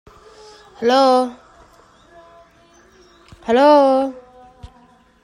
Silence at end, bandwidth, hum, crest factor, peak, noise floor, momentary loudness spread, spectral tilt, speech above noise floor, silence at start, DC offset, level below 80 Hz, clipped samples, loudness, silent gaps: 0.55 s; 11 kHz; none; 16 dB; -2 dBFS; -51 dBFS; 15 LU; -4.5 dB/octave; 38 dB; 0.8 s; under 0.1%; -54 dBFS; under 0.1%; -15 LUFS; none